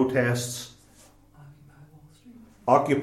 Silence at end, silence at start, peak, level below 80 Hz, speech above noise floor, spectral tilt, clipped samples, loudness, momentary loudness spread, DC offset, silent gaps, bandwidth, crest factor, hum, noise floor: 0 s; 0 s; -6 dBFS; -62 dBFS; 32 dB; -5.5 dB/octave; under 0.1%; -25 LUFS; 15 LU; under 0.1%; none; 16.5 kHz; 22 dB; 50 Hz at -60 dBFS; -55 dBFS